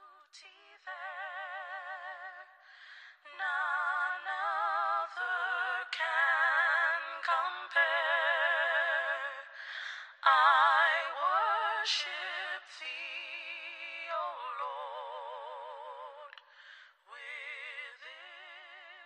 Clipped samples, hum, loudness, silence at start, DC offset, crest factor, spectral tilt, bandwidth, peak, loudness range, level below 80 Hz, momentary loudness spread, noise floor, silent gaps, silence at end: under 0.1%; none; -31 LUFS; 0 s; under 0.1%; 22 dB; 3.5 dB/octave; 10.5 kHz; -12 dBFS; 16 LU; under -90 dBFS; 21 LU; -57 dBFS; none; 0 s